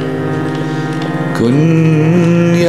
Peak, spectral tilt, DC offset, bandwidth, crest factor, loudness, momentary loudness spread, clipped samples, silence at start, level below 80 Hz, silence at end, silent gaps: -2 dBFS; -7.5 dB/octave; 1%; 11.5 kHz; 10 dB; -13 LUFS; 7 LU; under 0.1%; 0 s; -48 dBFS; 0 s; none